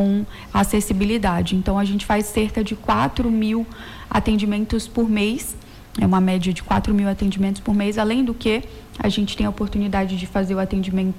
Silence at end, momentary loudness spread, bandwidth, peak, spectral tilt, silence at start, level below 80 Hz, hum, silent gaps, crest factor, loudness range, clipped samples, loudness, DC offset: 0 s; 5 LU; 16 kHz; -10 dBFS; -6 dB/octave; 0 s; -34 dBFS; none; none; 10 dB; 1 LU; under 0.1%; -21 LUFS; under 0.1%